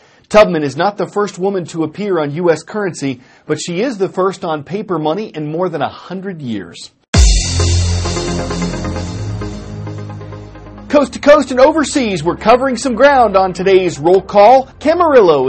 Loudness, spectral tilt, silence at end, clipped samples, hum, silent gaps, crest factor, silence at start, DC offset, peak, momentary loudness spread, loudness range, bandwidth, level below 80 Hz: -13 LUFS; -5 dB/octave; 0 s; 0.2%; none; 7.08-7.13 s; 14 dB; 0.3 s; under 0.1%; 0 dBFS; 17 LU; 8 LU; 8.8 kHz; -26 dBFS